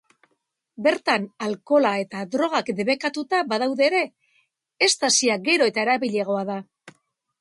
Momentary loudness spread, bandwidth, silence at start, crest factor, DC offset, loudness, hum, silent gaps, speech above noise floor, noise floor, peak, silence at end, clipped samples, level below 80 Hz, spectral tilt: 9 LU; 11.5 kHz; 0.8 s; 18 dB; under 0.1%; -22 LUFS; none; none; 52 dB; -74 dBFS; -6 dBFS; 0.5 s; under 0.1%; -74 dBFS; -2.5 dB/octave